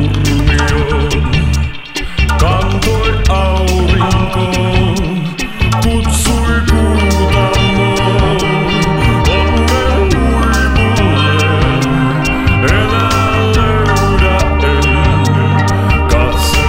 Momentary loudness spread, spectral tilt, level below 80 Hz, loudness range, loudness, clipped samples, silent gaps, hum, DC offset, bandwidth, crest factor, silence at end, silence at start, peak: 3 LU; -5.5 dB/octave; -16 dBFS; 2 LU; -12 LUFS; under 0.1%; none; none; under 0.1%; 16.5 kHz; 10 dB; 0 s; 0 s; 0 dBFS